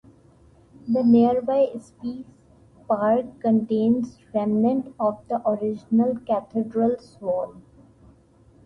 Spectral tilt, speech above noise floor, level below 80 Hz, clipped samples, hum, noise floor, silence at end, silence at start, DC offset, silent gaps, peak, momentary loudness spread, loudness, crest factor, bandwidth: -9 dB/octave; 33 dB; -60 dBFS; under 0.1%; none; -55 dBFS; 1.05 s; 0.85 s; under 0.1%; none; -8 dBFS; 13 LU; -23 LUFS; 16 dB; 5.8 kHz